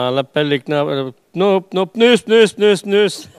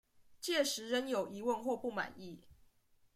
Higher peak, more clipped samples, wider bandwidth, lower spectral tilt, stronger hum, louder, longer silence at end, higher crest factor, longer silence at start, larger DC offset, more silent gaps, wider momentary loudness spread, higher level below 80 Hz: first, 0 dBFS vs -20 dBFS; neither; second, 13.5 kHz vs 16 kHz; first, -5 dB/octave vs -2.5 dB/octave; neither; first, -15 LUFS vs -37 LUFS; second, 0.15 s vs 0.6 s; second, 14 dB vs 20 dB; second, 0 s vs 0.2 s; neither; neither; second, 9 LU vs 17 LU; first, -66 dBFS vs -74 dBFS